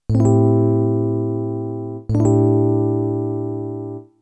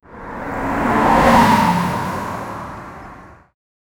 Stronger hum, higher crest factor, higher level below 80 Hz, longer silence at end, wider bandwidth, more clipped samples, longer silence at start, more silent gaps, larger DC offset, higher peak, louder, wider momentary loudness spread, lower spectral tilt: neither; about the same, 14 dB vs 18 dB; second, -44 dBFS vs -36 dBFS; second, 0.2 s vs 0.65 s; second, 8.2 kHz vs over 20 kHz; neither; about the same, 0.1 s vs 0.1 s; neither; neither; second, -4 dBFS vs 0 dBFS; about the same, -18 LUFS vs -16 LUFS; second, 12 LU vs 21 LU; first, -10.5 dB/octave vs -5.5 dB/octave